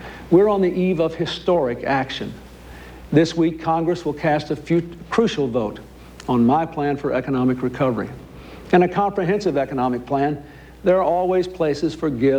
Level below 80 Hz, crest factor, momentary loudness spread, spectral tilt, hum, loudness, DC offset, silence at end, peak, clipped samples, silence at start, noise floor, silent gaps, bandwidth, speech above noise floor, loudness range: -46 dBFS; 18 dB; 15 LU; -7 dB/octave; none; -20 LUFS; under 0.1%; 0 s; -4 dBFS; under 0.1%; 0 s; -39 dBFS; none; 10.5 kHz; 20 dB; 2 LU